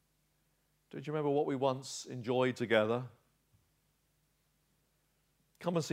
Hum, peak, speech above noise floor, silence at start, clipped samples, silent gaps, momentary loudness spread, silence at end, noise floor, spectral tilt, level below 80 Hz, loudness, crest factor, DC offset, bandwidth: none; -14 dBFS; 43 dB; 0.95 s; under 0.1%; none; 13 LU; 0 s; -76 dBFS; -5.5 dB/octave; -80 dBFS; -34 LUFS; 24 dB; under 0.1%; 15.5 kHz